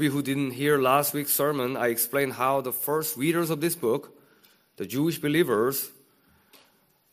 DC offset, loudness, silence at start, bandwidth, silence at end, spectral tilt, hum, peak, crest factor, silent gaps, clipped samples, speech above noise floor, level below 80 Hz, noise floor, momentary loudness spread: under 0.1%; -25 LUFS; 0 s; 15.5 kHz; 1.2 s; -4.5 dB/octave; none; -8 dBFS; 20 dB; none; under 0.1%; 39 dB; -70 dBFS; -64 dBFS; 6 LU